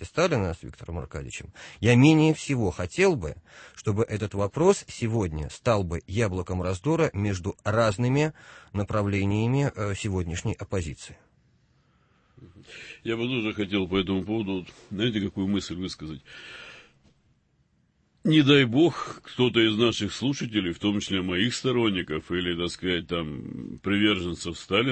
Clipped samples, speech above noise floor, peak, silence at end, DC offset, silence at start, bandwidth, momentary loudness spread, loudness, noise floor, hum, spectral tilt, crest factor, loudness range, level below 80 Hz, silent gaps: under 0.1%; 42 dB; -6 dBFS; 0 s; under 0.1%; 0 s; 8.8 kHz; 16 LU; -26 LUFS; -68 dBFS; none; -5.5 dB/octave; 20 dB; 9 LU; -50 dBFS; none